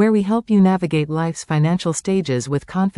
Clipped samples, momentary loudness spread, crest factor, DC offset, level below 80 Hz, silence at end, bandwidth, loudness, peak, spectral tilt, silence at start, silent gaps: under 0.1%; 7 LU; 12 dB; under 0.1%; -52 dBFS; 0.1 s; 11.5 kHz; -19 LUFS; -6 dBFS; -6.5 dB/octave; 0 s; none